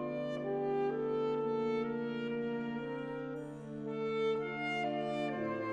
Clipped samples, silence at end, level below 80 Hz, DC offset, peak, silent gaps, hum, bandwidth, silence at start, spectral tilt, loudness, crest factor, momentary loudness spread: under 0.1%; 0 s; -72 dBFS; under 0.1%; -24 dBFS; none; none; 9 kHz; 0 s; -7 dB/octave; -37 LUFS; 12 dB; 7 LU